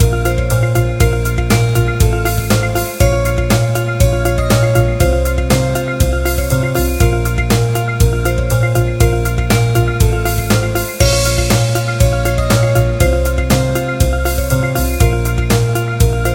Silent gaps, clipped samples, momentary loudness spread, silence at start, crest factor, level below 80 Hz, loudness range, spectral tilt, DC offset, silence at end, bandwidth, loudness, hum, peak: none; under 0.1%; 3 LU; 0 s; 12 dB; -18 dBFS; 1 LU; -5.5 dB/octave; under 0.1%; 0 s; 17 kHz; -14 LUFS; none; 0 dBFS